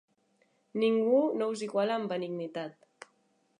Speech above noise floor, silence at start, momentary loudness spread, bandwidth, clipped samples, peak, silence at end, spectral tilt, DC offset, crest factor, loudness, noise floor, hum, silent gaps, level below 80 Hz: 42 dB; 0.75 s; 14 LU; 10.5 kHz; under 0.1%; -16 dBFS; 0.9 s; -6 dB/octave; under 0.1%; 16 dB; -30 LUFS; -72 dBFS; none; none; -88 dBFS